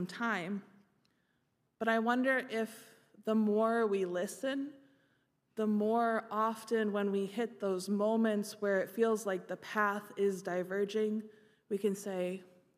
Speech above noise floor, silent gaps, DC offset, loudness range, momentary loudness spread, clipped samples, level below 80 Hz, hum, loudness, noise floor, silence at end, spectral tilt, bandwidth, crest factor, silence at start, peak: 45 dB; none; under 0.1%; 3 LU; 9 LU; under 0.1%; -90 dBFS; none; -34 LUFS; -78 dBFS; 0.3 s; -5.5 dB/octave; 15.5 kHz; 18 dB; 0 s; -16 dBFS